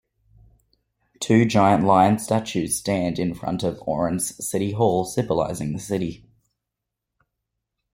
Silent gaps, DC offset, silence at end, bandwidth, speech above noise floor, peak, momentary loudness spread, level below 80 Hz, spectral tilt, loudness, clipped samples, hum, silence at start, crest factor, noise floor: none; under 0.1%; 1.75 s; 16.5 kHz; 62 dB; -4 dBFS; 10 LU; -54 dBFS; -5.5 dB/octave; -22 LUFS; under 0.1%; none; 1.2 s; 20 dB; -84 dBFS